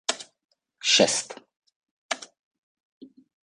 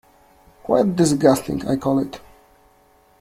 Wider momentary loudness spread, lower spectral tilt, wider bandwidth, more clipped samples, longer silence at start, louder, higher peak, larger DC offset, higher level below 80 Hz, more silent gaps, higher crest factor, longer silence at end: first, 20 LU vs 16 LU; second, -1 dB/octave vs -6 dB/octave; second, 11 kHz vs 16 kHz; neither; second, 0.1 s vs 0.65 s; second, -23 LUFS vs -19 LUFS; second, -6 dBFS vs -2 dBFS; neither; second, -74 dBFS vs -50 dBFS; first, 0.45-0.49 s, 1.57-1.62 s, 1.76-1.81 s, 1.91-2.09 s, 2.39-2.51 s, 2.58-3.01 s vs none; about the same, 24 dB vs 20 dB; second, 0.4 s vs 1.05 s